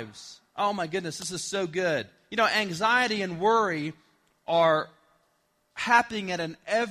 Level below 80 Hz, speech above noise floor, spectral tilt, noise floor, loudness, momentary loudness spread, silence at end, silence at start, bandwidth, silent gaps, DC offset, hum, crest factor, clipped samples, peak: -68 dBFS; 44 dB; -3.5 dB/octave; -71 dBFS; -26 LUFS; 15 LU; 0 s; 0 s; 15 kHz; none; under 0.1%; none; 22 dB; under 0.1%; -6 dBFS